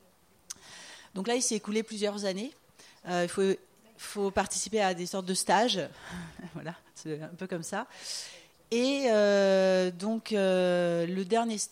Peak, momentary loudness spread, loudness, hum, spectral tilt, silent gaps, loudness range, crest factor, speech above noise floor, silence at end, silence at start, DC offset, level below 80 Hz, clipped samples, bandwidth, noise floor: -12 dBFS; 18 LU; -29 LUFS; none; -4 dB/octave; none; 6 LU; 20 dB; 35 dB; 0.05 s; 0.5 s; under 0.1%; -66 dBFS; under 0.1%; 16 kHz; -64 dBFS